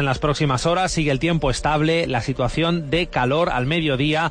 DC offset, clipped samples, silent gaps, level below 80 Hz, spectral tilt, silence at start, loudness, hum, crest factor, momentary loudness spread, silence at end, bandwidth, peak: under 0.1%; under 0.1%; none; -36 dBFS; -5.5 dB/octave; 0 s; -20 LUFS; none; 12 dB; 2 LU; 0 s; 10.5 kHz; -8 dBFS